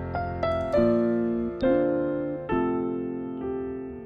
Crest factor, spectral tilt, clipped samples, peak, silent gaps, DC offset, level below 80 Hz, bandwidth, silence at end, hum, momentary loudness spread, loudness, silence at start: 14 dB; -9 dB/octave; under 0.1%; -12 dBFS; none; under 0.1%; -48 dBFS; 6.4 kHz; 0 s; none; 9 LU; -27 LUFS; 0 s